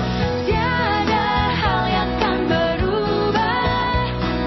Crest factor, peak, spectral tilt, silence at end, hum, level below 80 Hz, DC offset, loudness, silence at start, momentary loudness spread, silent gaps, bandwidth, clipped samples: 12 dB; -8 dBFS; -6.5 dB/octave; 0 s; none; -30 dBFS; under 0.1%; -19 LUFS; 0 s; 2 LU; none; 6 kHz; under 0.1%